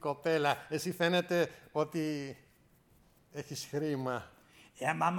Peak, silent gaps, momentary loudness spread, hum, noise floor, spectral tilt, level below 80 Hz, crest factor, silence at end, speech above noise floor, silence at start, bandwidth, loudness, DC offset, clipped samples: -16 dBFS; none; 16 LU; none; -66 dBFS; -5 dB/octave; -72 dBFS; 20 dB; 0 s; 32 dB; 0 s; 19 kHz; -34 LUFS; under 0.1%; under 0.1%